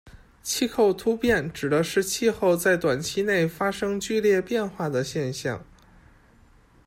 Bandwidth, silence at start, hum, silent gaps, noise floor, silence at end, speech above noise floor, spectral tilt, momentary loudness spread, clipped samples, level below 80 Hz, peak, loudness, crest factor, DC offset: 16 kHz; 0.05 s; none; none; -56 dBFS; 1.25 s; 32 dB; -4.5 dB/octave; 7 LU; under 0.1%; -52 dBFS; -10 dBFS; -24 LUFS; 16 dB; under 0.1%